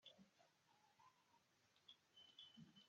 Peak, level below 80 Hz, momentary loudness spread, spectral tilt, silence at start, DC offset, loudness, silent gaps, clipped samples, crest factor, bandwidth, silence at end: -50 dBFS; under -90 dBFS; 5 LU; -2 dB/octave; 0 s; under 0.1%; -66 LUFS; none; under 0.1%; 20 dB; 7.2 kHz; 0 s